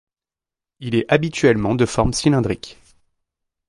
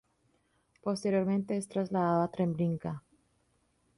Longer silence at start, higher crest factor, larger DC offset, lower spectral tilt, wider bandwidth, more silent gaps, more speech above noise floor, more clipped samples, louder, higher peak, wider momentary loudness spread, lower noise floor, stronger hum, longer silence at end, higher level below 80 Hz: about the same, 0.8 s vs 0.85 s; about the same, 20 dB vs 16 dB; neither; second, -5.5 dB/octave vs -7.5 dB/octave; about the same, 11.5 kHz vs 11.5 kHz; neither; first, 71 dB vs 42 dB; neither; first, -19 LUFS vs -32 LUFS; first, -2 dBFS vs -18 dBFS; about the same, 12 LU vs 10 LU; first, -89 dBFS vs -73 dBFS; neither; about the same, 0.95 s vs 1 s; first, -40 dBFS vs -68 dBFS